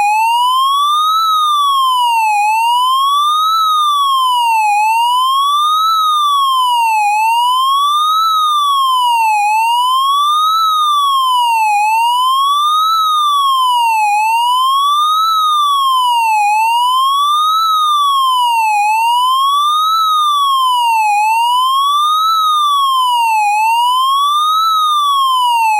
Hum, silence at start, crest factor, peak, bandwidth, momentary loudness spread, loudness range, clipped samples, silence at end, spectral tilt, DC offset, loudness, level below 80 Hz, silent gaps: none; 0 s; 6 dB; -6 dBFS; 16 kHz; 1 LU; 0 LU; under 0.1%; 0 s; 8.5 dB/octave; under 0.1%; -11 LUFS; under -90 dBFS; none